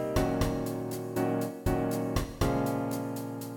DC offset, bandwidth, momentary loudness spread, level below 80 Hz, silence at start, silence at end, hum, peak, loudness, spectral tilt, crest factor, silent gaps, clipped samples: under 0.1%; 17.5 kHz; 6 LU; -42 dBFS; 0 s; 0 s; none; -14 dBFS; -31 LUFS; -6.5 dB/octave; 18 dB; none; under 0.1%